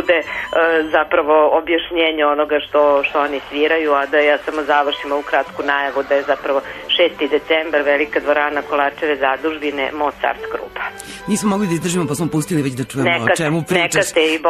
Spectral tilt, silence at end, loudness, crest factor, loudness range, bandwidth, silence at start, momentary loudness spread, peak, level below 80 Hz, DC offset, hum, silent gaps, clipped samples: -4 dB/octave; 0 s; -17 LUFS; 14 dB; 4 LU; 13.5 kHz; 0 s; 6 LU; -4 dBFS; -50 dBFS; under 0.1%; none; none; under 0.1%